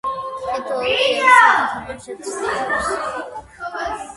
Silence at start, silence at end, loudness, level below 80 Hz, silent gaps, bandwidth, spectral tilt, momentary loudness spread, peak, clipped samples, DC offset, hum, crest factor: 0.05 s; 0 s; -17 LUFS; -50 dBFS; none; 11.5 kHz; -2 dB/octave; 19 LU; 0 dBFS; under 0.1%; under 0.1%; none; 20 dB